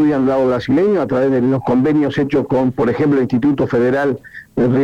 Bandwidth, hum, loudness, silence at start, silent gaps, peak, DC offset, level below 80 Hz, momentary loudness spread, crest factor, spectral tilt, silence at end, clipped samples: 7.6 kHz; none; -15 LUFS; 0 s; none; -8 dBFS; under 0.1%; -46 dBFS; 3 LU; 6 dB; -8.5 dB/octave; 0 s; under 0.1%